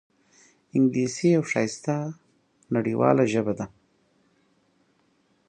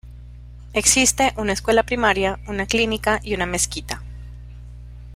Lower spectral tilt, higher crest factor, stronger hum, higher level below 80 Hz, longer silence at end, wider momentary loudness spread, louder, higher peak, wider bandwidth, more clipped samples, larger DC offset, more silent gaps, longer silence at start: first, -6.5 dB/octave vs -2.5 dB/octave; about the same, 22 dB vs 22 dB; second, none vs 60 Hz at -35 dBFS; second, -66 dBFS vs -36 dBFS; first, 1.8 s vs 0 s; second, 10 LU vs 24 LU; second, -24 LUFS vs -19 LUFS; second, -4 dBFS vs 0 dBFS; second, 9.8 kHz vs 16 kHz; neither; neither; neither; first, 0.75 s vs 0.05 s